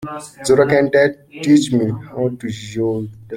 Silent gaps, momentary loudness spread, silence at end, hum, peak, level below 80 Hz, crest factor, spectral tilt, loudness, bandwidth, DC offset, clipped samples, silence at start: none; 13 LU; 0 s; none; -2 dBFS; -52 dBFS; 16 dB; -6 dB/octave; -17 LUFS; 13.5 kHz; under 0.1%; under 0.1%; 0 s